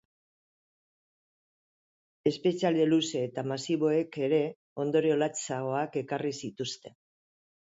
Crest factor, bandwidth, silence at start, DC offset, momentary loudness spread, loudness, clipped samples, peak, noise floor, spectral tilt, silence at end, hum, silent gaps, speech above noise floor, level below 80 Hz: 18 dB; 8 kHz; 2.25 s; under 0.1%; 10 LU; -30 LUFS; under 0.1%; -12 dBFS; under -90 dBFS; -5 dB/octave; 0.85 s; none; 4.56-4.76 s; over 61 dB; -76 dBFS